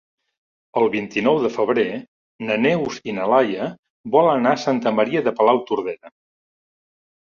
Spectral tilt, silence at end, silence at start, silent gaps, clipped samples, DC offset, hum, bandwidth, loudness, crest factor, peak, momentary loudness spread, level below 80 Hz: -6 dB/octave; 1.2 s; 0.75 s; 2.08-2.39 s, 3.79-3.83 s, 3.90-4.04 s; under 0.1%; under 0.1%; none; 7.2 kHz; -20 LUFS; 20 dB; -2 dBFS; 12 LU; -64 dBFS